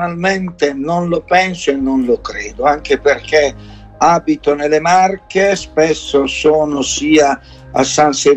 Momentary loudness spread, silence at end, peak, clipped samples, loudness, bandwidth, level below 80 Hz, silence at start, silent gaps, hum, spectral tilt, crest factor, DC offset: 6 LU; 0 s; 0 dBFS; under 0.1%; -14 LUFS; 8.6 kHz; -40 dBFS; 0 s; none; none; -4 dB/octave; 14 dB; under 0.1%